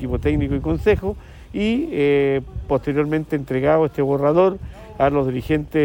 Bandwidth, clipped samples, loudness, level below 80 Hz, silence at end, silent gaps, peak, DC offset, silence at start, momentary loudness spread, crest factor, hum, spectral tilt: 17 kHz; under 0.1%; -20 LUFS; -34 dBFS; 0 s; none; -4 dBFS; under 0.1%; 0 s; 7 LU; 14 dB; none; -8.5 dB/octave